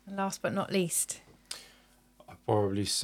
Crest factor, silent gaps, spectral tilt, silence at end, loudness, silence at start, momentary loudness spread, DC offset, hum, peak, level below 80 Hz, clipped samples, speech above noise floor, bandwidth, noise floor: 20 dB; none; -4 dB/octave; 0 s; -31 LUFS; 0.05 s; 15 LU; under 0.1%; none; -14 dBFS; -68 dBFS; under 0.1%; 31 dB; 19 kHz; -62 dBFS